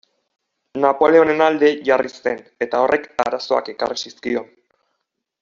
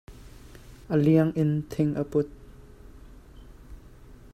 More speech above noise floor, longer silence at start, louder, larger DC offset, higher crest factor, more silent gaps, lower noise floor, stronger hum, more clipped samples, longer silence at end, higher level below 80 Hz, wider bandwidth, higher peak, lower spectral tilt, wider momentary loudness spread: first, 58 dB vs 25 dB; first, 0.75 s vs 0.1 s; first, -18 LUFS vs -25 LUFS; neither; about the same, 18 dB vs 20 dB; neither; first, -75 dBFS vs -48 dBFS; neither; neither; first, 0.95 s vs 0.2 s; second, -62 dBFS vs -50 dBFS; second, 7.4 kHz vs 13.5 kHz; first, -2 dBFS vs -8 dBFS; second, -2.5 dB/octave vs -9 dB/octave; first, 12 LU vs 7 LU